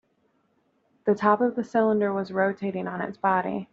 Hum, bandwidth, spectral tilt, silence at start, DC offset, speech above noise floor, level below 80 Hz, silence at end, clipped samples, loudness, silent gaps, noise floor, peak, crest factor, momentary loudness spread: none; 7.4 kHz; -6 dB/octave; 1.05 s; under 0.1%; 44 dB; -70 dBFS; 0.1 s; under 0.1%; -25 LUFS; none; -69 dBFS; -6 dBFS; 20 dB; 9 LU